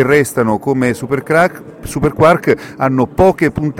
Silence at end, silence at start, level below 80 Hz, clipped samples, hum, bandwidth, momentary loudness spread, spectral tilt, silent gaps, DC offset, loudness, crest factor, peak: 0 s; 0 s; -36 dBFS; under 0.1%; none; 17 kHz; 7 LU; -6.5 dB/octave; none; under 0.1%; -13 LUFS; 14 dB; 0 dBFS